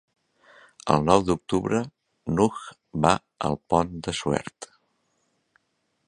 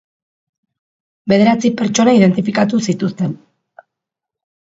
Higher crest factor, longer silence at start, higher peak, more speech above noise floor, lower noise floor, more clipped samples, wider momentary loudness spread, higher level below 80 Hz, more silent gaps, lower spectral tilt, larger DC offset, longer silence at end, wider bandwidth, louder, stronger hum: first, 26 dB vs 16 dB; second, 0.85 s vs 1.25 s; about the same, -2 dBFS vs 0 dBFS; second, 50 dB vs 70 dB; second, -74 dBFS vs -83 dBFS; neither; first, 18 LU vs 12 LU; first, -50 dBFS vs -56 dBFS; neither; about the same, -5.5 dB/octave vs -6 dB/octave; neither; about the same, 1.45 s vs 1.35 s; first, 11 kHz vs 8 kHz; second, -25 LUFS vs -14 LUFS; neither